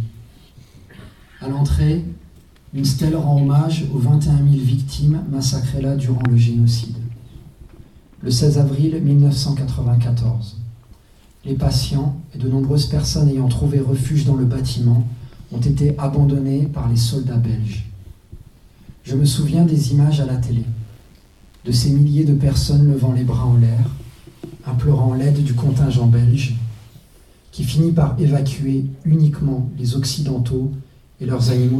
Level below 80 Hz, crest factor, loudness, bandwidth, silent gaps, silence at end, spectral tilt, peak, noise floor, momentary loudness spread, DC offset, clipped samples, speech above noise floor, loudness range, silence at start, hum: -34 dBFS; 14 dB; -18 LUFS; 13 kHz; none; 0 s; -7 dB/octave; -4 dBFS; -49 dBFS; 13 LU; under 0.1%; under 0.1%; 32 dB; 3 LU; 0 s; none